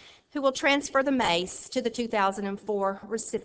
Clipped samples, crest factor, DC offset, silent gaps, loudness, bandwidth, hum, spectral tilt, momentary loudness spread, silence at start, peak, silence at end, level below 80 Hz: under 0.1%; 18 dB; under 0.1%; none; -27 LUFS; 8 kHz; none; -3.5 dB/octave; 8 LU; 0.05 s; -10 dBFS; 0 s; -62 dBFS